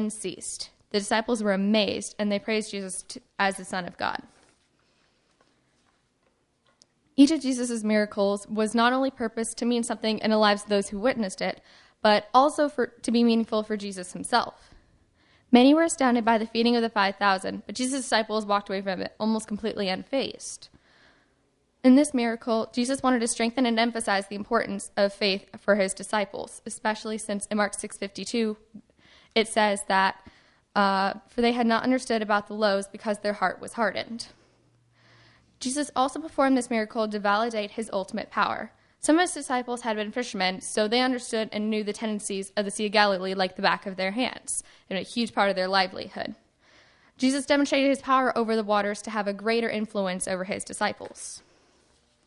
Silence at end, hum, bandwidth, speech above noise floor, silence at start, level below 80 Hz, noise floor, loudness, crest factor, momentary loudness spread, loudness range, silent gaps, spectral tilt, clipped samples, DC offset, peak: 0.9 s; none; 11.5 kHz; 44 dB; 0 s; -64 dBFS; -70 dBFS; -26 LUFS; 24 dB; 11 LU; 6 LU; none; -3.5 dB/octave; under 0.1%; under 0.1%; -4 dBFS